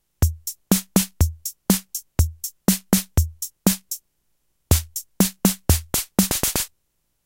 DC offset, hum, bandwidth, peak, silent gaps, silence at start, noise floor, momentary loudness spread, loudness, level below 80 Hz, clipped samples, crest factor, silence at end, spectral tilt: under 0.1%; none; 17 kHz; -2 dBFS; none; 0.2 s; -71 dBFS; 8 LU; -22 LUFS; -32 dBFS; under 0.1%; 22 dB; 0.6 s; -4 dB/octave